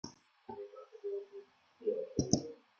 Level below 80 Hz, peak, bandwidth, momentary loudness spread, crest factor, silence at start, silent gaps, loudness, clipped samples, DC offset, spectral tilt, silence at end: -66 dBFS; -10 dBFS; 7.4 kHz; 19 LU; 32 dB; 0.05 s; none; -39 LUFS; under 0.1%; under 0.1%; -7 dB/octave; 0.25 s